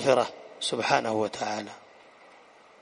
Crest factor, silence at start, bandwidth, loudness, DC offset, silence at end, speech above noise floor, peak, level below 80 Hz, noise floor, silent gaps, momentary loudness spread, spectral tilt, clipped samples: 24 dB; 0 s; 10.5 kHz; -28 LUFS; under 0.1%; 1 s; 28 dB; -6 dBFS; -72 dBFS; -54 dBFS; none; 13 LU; -3.5 dB/octave; under 0.1%